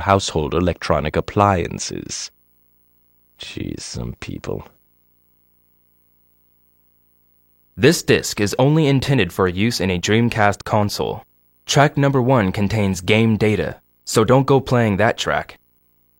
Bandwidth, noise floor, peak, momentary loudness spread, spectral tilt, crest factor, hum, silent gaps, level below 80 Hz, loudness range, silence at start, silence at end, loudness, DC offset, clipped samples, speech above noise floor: 16.5 kHz; -60 dBFS; 0 dBFS; 14 LU; -5.5 dB/octave; 20 dB; 60 Hz at -50 dBFS; none; -42 dBFS; 15 LU; 0 s; 0.65 s; -18 LUFS; under 0.1%; under 0.1%; 42 dB